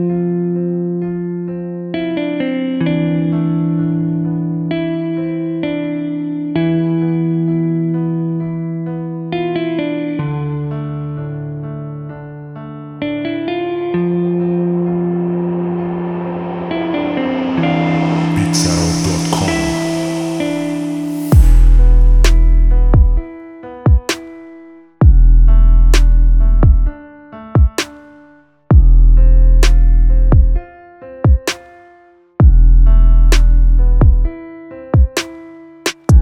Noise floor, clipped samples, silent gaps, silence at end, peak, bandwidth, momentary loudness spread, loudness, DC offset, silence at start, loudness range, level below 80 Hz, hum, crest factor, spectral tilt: -46 dBFS; under 0.1%; none; 0 s; 0 dBFS; 11.5 kHz; 12 LU; -15 LUFS; under 0.1%; 0 s; 7 LU; -14 dBFS; none; 12 dB; -6.5 dB/octave